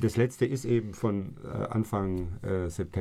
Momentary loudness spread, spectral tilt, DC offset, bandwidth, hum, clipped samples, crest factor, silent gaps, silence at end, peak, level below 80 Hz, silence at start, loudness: 7 LU; -7.5 dB/octave; under 0.1%; 14.5 kHz; none; under 0.1%; 16 dB; none; 0 s; -14 dBFS; -48 dBFS; 0 s; -31 LUFS